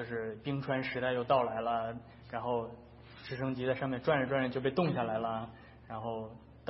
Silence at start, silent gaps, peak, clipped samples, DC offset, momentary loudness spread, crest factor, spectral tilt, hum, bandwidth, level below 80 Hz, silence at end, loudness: 0 s; none; -16 dBFS; under 0.1%; under 0.1%; 17 LU; 18 dB; -5 dB/octave; none; 5.8 kHz; -62 dBFS; 0 s; -34 LUFS